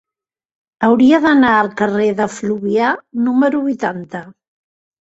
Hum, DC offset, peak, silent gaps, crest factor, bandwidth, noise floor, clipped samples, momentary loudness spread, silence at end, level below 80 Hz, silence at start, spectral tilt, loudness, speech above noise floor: none; under 0.1%; -2 dBFS; none; 14 dB; 8 kHz; -88 dBFS; under 0.1%; 11 LU; 0.85 s; -56 dBFS; 0.8 s; -6 dB/octave; -15 LUFS; 73 dB